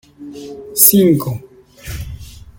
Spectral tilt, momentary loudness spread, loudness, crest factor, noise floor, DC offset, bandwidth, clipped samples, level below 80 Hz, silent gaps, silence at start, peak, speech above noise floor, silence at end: -4.5 dB/octave; 25 LU; -11 LUFS; 16 dB; -33 dBFS; under 0.1%; 17 kHz; 0.1%; -38 dBFS; none; 0.2 s; 0 dBFS; 19 dB; 0.2 s